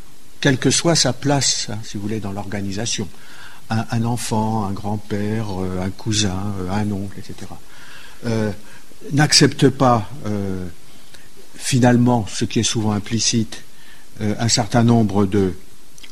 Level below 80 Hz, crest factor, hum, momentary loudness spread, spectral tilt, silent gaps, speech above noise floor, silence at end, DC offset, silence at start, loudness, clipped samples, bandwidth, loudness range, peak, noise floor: -46 dBFS; 20 dB; none; 19 LU; -4.5 dB/octave; none; 26 dB; 0.05 s; 4%; 0.4 s; -19 LUFS; under 0.1%; 13.5 kHz; 6 LU; 0 dBFS; -45 dBFS